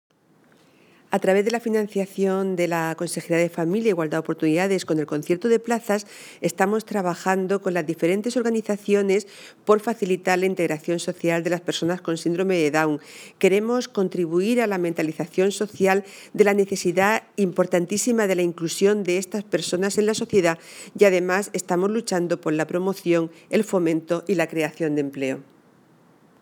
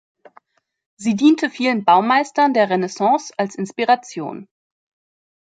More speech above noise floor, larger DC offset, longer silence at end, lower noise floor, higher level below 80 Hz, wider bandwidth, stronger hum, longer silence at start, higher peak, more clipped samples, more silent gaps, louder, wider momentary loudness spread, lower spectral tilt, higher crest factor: about the same, 36 dB vs 36 dB; neither; about the same, 1 s vs 1 s; first, -58 dBFS vs -54 dBFS; about the same, -74 dBFS vs -70 dBFS; first, over 20 kHz vs 9.2 kHz; neither; about the same, 1.1 s vs 1 s; about the same, -2 dBFS vs -2 dBFS; neither; neither; second, -23 LUFS vs -17 LUFS; second, 5 LU vs 13 LU; about the same, -5 dB/octave vs -5 dB/octave; about the same, 20 dB vs 18 dB